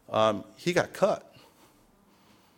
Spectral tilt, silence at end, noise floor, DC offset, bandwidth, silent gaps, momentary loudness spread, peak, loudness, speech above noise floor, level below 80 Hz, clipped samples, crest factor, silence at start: -5 dB/octave; 1.4 s; -61 dBFS; under 0.1%; 17.5 kHz; none; 6 LU; -8 dBFS; -28 LUFS; 35 dB; -66 dBFS; under 0.1%; 22 dB; 0.1 s